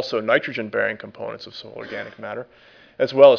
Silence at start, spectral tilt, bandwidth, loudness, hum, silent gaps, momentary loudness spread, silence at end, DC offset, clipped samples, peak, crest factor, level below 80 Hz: 0 s; -5.5 dB/octave; 5.4 kHz; -23 LUFS; none; none; 15 LU; 0 s; under 0.1%; under 0.1%; 0 dBFS; 20 dB; -70 dBFS